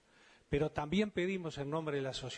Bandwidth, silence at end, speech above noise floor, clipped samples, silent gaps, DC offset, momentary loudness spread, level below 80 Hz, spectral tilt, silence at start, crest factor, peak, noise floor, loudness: 10 kHz; 0 s; 29 dB; under 0.1%; none; under 0.1%; 5 LU; -58 dBFS; -6 dB/octave; 0.5 s; 18 dB; -18 dBFS; -65 dBFS; -37 LUFS